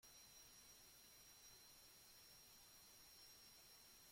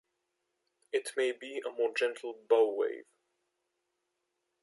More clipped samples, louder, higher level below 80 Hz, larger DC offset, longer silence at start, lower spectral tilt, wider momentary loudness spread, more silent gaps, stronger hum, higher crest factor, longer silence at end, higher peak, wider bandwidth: neither; second, -64 LUFS vs -32 LUFS; first, -84 dBFS vs under -90 dBFS; neither; second, 0 s vs 0.95 s; about the same, -0.5 dB/octave vs -1 dB/octave; second, 1 LU vs 12 LU; neither; neither; second, 14 dB vs 22 dB; second, 0 s vs 1.6 s; second, -52 dBFS vs -14 dBFS; first, 16.5 kHz vs 11.5 kHz